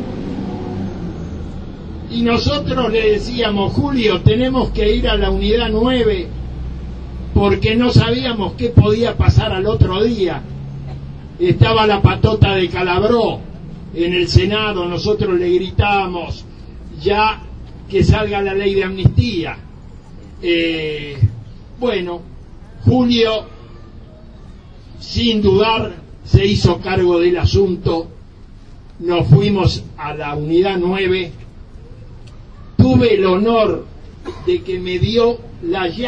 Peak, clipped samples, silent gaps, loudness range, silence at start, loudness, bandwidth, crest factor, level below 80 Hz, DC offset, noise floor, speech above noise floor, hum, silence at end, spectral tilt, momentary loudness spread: 0 dBFS; under 0.1%; none; 4 LU; 0 s; -16 LUFS; 8.4 kHz; 16 dB; -28 dBFS; under 0.1%; -37 dBFS; 23 dB; none; 0 s; -7 dB/octave; 16 LU